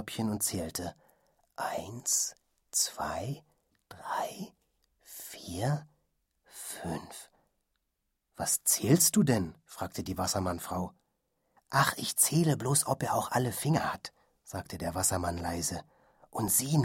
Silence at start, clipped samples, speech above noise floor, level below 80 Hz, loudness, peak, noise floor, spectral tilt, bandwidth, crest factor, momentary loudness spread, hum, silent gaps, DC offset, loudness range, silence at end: 0 s; under 0.1%; 51 dB; -60 dBFS; -30 LUFS; -10 dBFS; -82 dBFS; -4 dB/octave; 16.5 kHz; 22 dB; 18 LU; none; none; under 0.1%; 10 LU; 0 s